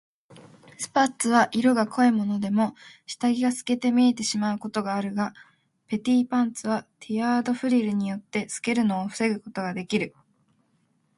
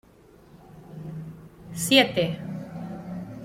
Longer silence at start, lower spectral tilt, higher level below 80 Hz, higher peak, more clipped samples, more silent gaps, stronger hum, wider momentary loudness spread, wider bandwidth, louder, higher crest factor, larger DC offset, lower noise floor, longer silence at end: second, 0.3 s vs 0.55 s; about the same, -4.5 dB/octave vs -4 dB/octave; second, -70 dBFS vs -58 dBFS; about the same, -6 dBFS vs -4 dBFS; neither; neither; neither; second, 10 LU vs 23 LU; second, 11.5 kHz vs 16.5 kHz; about the same, -25 LUFS vs -24 LUFS; about the same, 20 dB vs 24 dB; neither; first, -68 dBFS vs -53 dBFS; first, 1.1 s vs 0 s